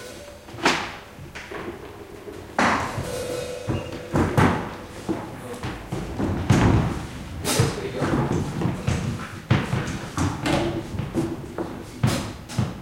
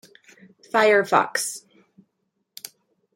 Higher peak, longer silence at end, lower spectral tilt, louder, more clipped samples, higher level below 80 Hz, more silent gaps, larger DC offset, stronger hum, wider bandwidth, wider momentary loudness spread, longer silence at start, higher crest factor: second, -6 dBFS vs -2 dBFS; second, 0 s vs 1.55 s; first, -5.5 dB/octave vs -2.5 dB/octave; second, -25 LUFS vs -20 LUFS; neither; first, -40 dBFS vs -80 dBFS; neither; neither; neither; about the same, 16.5 kHz vs 16.5 kHz; second, 14 LU vs 22 LU; second, 0 s vs 0.75 s; about the same, 20 dB vs 22 dB